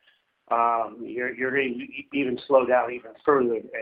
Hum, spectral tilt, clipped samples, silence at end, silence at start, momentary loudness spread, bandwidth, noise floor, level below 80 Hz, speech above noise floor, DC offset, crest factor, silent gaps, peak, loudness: none; -8.5 dB/octave; under 0.1%; 0 s; 0.5 s; 10 LU; 4.8 kHz; -62 dBFS; -68 dBFS; 37 dB; under 0.1%; 20 dB; none; -6 dBFS; -25 LUFS